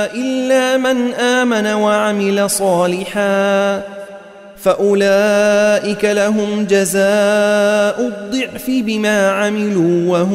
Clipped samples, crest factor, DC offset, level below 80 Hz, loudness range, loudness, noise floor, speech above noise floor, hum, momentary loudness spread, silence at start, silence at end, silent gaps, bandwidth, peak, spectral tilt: under 0.1%; 12 dB; under 0.1%; -54 dBFS; 2 LU; -14 LUFS; -36 dBFS; 22 dB; none; 7 LU; 0 s; 0 s; none; 16 kHz; -2 dBFS; -4.5 dB/octave